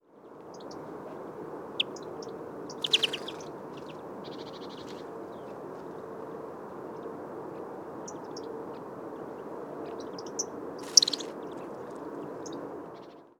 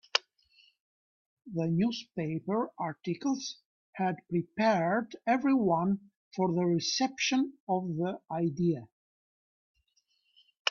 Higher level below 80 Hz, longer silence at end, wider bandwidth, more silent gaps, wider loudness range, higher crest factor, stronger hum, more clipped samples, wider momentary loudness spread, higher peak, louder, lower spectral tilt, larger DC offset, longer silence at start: about the same, -74 dBFS vs -72 dBFS; about the same, 0.05 s vs 0 s; first, 20 kHz vs 7.2 kHz; second, none vs 0.80-1.37 s, 3.66-3.93 s, 6.17-6.31 s, 7.60-7.67 s, 8.92-9.75 s, 10.59-10.65 s; first, 12 LU vs 5 LU; first, 34 dB vs 24 dB; neither; neither; first, 16 LU vs 9 LU; first, -2 dBFS vs -8 dBFS; second, -34 LUFS vs -31 LUFS; second, -1 dB/octave vs -5 dB/octave; neither; about the same, 0.1 s vs 0.15 s